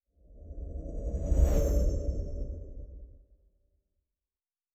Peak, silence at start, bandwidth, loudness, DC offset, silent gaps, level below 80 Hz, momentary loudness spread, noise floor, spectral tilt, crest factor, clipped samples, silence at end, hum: -14 dBFS; 0.3 s; 15 kHz; -32 LUFS; under 0.1%; none; -32 dBFS; 21 LU; under -90 dBFS; -8 dB/octave; 20 dB; under 0.1%; 1.6 s; none